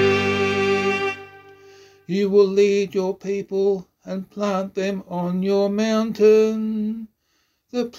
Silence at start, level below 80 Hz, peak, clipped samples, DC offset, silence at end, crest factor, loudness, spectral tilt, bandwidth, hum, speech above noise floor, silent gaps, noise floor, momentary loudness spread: 0 s; -62 dBFS; -6 dBFS; under 0.1%; under 0.1%; 0 s; 16 dB; -21 LUFS; -6 dB/octave; 8 kHz; none; 48 dB; none; -68 dBFS; 12 LU